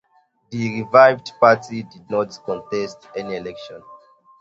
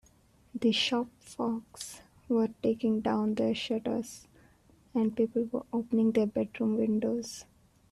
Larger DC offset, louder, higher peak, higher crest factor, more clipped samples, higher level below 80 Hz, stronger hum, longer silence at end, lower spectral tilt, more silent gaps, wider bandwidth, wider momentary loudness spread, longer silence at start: neither; first, -19 LUFS vs -31 LUFS; first, 0 dBFS vs -14 dBFS; about the same, 20 dB vs 16 dB; neither; about the same, -62 dBFS vs -66 dBFS; neither; about the same, 0.45 s vs 0.5 s; about the same, -6 dB/octave vs -5 dB/octave; neither; second, 8 kHz vs 13 kHz; first, 19 LU vs 15 LU; about the same, 0.5 s vs 0.55 s